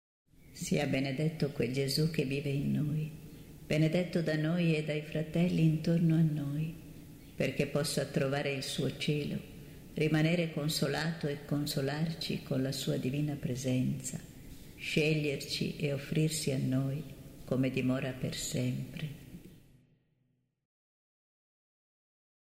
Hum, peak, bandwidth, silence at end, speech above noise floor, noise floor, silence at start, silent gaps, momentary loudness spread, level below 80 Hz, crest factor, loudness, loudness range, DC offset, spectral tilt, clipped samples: none; -16 dBFS; 16 kHz; 2.95 s; 45 dB; -77 dBFS; 0.5 s; none; 15 LU; -58 dBFS; 18 dB; -33 LUFS; 5 LU; under 0.1%; -5.5 dB/octave; under 0.1%